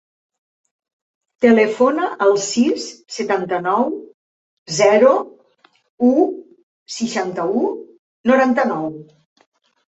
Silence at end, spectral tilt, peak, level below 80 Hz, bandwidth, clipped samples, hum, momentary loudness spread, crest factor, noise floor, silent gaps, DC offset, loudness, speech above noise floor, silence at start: 0.95 s; -4.5 dB/octave; -2 dBFS; -64 dBFS; 8.2 kHz; under 0.1%; none; 15 LU; 18 dB; -57 dBFS; 4.14-4.66 s, 5.89-5.98 s, 6.63-6.86 s, 7.99-8.24 s; under 0.1%; -17 LUFS; 40 dB; 1.4 s